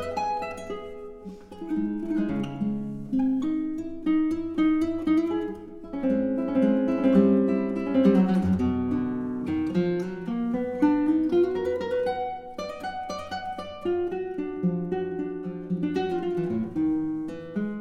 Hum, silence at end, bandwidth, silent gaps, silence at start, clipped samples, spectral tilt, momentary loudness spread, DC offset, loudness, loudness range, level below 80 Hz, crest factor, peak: none; 0 s; 9.8 kHz; none; 0 s; under 0.1%; -8.5 dB/octave; 12 LU; under 0.1%; -26 LUFS; 7 LU; -54 dBFS; 18 dB; -8 dBFS